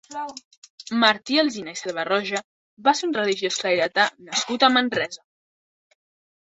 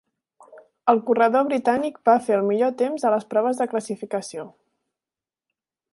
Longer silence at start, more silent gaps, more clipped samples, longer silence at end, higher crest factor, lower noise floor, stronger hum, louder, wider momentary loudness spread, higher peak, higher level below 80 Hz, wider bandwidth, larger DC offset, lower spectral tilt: second, 0.1 s vs 0.55 s; first, 0.44-0.51 s, 0.57-0.62 s, 0.70-0.78 s, 2.44-2.77 s vs none; neither; second, 1.3 s vs 1.45 s; about the same, 22 dB vs 20 dB; about the same, under -90 dBFS vs under -90 dBFS; neither; about the same, -22 LUFS vs -22 LUFS; first, 15 LU vs 11 LU; about the same, -2 dBFS vs -4 dBFS; about the same, -70 dBFS vs -74 dBFS; second, 8.2 kHz vs 11.5 kHz; neither; second, -2.5 dB/octave vs -5.5 dB/octave